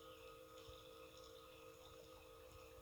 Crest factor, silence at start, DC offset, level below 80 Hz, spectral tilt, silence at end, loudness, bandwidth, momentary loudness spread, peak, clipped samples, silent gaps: 16 dB; 0 s; under 0.1%; -72 dBFS; -3.5 dB/octave; 0 s; -60 LUFS; over 20 kHz; 2 LU; -44 dBFS; under 0.1%; none